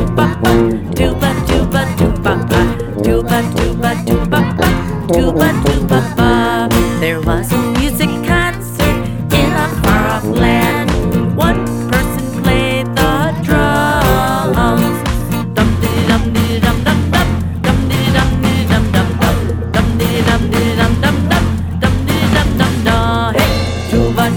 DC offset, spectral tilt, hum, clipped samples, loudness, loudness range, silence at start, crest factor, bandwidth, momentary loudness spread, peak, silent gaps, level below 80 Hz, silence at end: under 0.1%; -6 dB/octave; none; under 0.1%; -13 LUFS; 1 LU; 0 s; 12 dB; over 20 kHz; 4 LU; 0 dBFS; none; -22 dBFS; 0 s